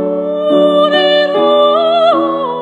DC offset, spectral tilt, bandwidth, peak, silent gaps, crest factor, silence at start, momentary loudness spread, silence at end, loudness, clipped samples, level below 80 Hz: under 0.1%; -6 dB/octave; 8.2 kHz; 0 dBFS; none; 10 dB; 0 s; 6 LU; 0 s; -11 LUFS; under 0.1%; -70 dBFS